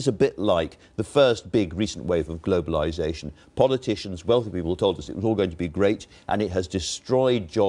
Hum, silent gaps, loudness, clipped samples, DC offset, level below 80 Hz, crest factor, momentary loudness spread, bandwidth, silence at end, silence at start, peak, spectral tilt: none; none; -24 LUFS; under 0.1%; under 0.1%; -46 dBFS; 20 dB; 8 LU; 10.5 kHz; 0 s; 0 s; -4 dBFS; -5.5 dB/octave